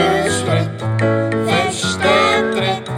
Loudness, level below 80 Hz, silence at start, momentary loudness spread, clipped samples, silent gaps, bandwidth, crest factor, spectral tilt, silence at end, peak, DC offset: -16 LUFS; -50 dBFS; 0 s; 5 LU; under 0.1%; none; 15.5 kHz; 16 dB; -4.5 dB/octave; 0 s; 0 dBFS; under 0.1%